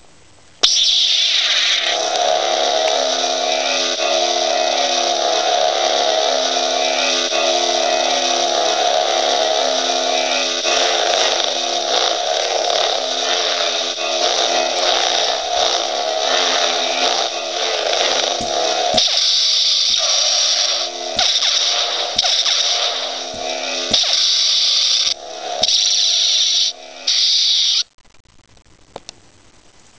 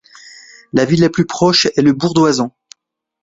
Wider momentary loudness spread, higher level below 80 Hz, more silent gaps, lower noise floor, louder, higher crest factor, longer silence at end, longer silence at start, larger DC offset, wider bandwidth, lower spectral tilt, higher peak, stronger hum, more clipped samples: about the same, 6 LU vs 8 LU; second, -58 dBFS vs -50 dBFS; first, 27.94-27.98 s vs none; second, -49 dBFS vs -67 dBFS; about the same, -15 LUFS vs -14 LUFS; about the same, 18 dB vs 16 dB; first, 1 s vs 0.75 s; first, 0.65 s vs 0.25 s; first, 0.3% vs under 0.1%; about the same, 8 kHz vs 8 kHz; second, 1 dB/octave vs -5 dB/octave; about the same, 0 dBFS vs 0 dBFS; neither; neither